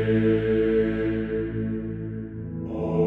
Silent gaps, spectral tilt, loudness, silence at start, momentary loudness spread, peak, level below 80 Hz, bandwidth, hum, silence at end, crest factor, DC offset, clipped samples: none; -10 dB/octave; -26 LUFS; 0 s; 12 LU; -12 dBFS; -42 dBFS; 4.4 kHz; none; 0 s; 14 dB; under 0.1%; under 0.1%